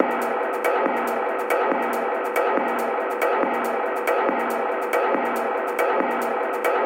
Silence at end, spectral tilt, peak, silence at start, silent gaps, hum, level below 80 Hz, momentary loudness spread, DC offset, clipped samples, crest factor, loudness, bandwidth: 0 s; -3.5 dB/octave; -2 dBFS; 0 s; none; none; -76 dBFS; 3 LU; under 0.1%; under 0.1%; 20 dB; -23 LUFS; 17 kHz